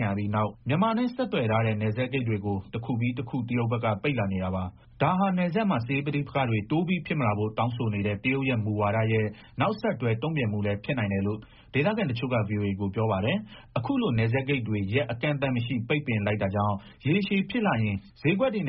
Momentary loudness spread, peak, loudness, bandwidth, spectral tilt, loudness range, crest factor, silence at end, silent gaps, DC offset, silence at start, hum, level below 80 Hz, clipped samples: 5 LU; -10 dBFS; -27 LUFS; 5.6 kHz; -6 dB/octave; 1 LU; 16 dB; 0 s; none; under 0.1%; 0 s; none; -56 dBFS; under 0.1%